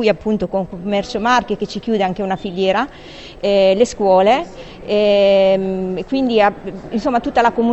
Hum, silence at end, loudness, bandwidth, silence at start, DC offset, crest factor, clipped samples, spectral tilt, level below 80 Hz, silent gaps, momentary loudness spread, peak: none; 0 s; -16 LUFS; 8.4 kHz; 0 s; under 0.1%; 16 dB; under 0.1%; -5.5 dB/octave; -44 dBFS; none; 11 LU; 0 dBFS